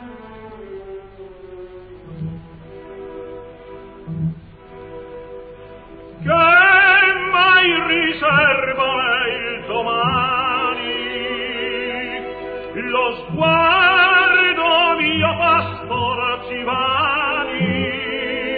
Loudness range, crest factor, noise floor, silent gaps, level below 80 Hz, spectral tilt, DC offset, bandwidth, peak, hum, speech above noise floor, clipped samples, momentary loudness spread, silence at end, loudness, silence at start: 19 LU; 16 dB; -38 dBFS; none; -48 dBFS; -7.5 dB/octave; under 0.1%; 4.9 kHz; -4 dBFS; none; 22 dB; under 0.1%; 25 LU; 0 s; -16 LUFS; 0 s